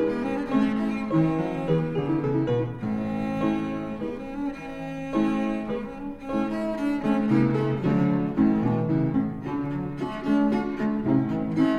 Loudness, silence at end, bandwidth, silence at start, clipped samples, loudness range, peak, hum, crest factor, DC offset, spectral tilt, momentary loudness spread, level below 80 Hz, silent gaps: -26 LUFS; 0 s; 10 kHz; 0 s; under 0.1%; 5 LU; -10 dBFS; none; 16 dB; under 0.1%; -9 dB/octave; 9 LU; -48 dBFS; none